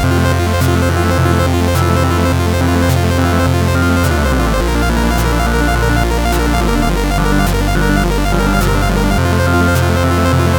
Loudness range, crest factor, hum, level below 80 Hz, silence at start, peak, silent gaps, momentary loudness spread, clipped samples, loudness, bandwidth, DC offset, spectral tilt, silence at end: 1 LU; 12 dB; none; -18 dBFS; 0 s; 0 dBFS; none; 2 LU; under 0.1%; -13 LUFS; over 20 kHz; under 0.1%; -6 dB/octave; 0 s